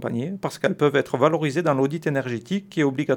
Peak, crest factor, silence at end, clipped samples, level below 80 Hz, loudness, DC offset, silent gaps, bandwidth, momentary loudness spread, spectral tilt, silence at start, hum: -4 dBFS; 18 dB; 0 s; under 0.1%; -68 dBFS; -23 LUFS; under 0.1%; none; 18 kHz; 7 LU; -6.5 dB/octave; 0 s; none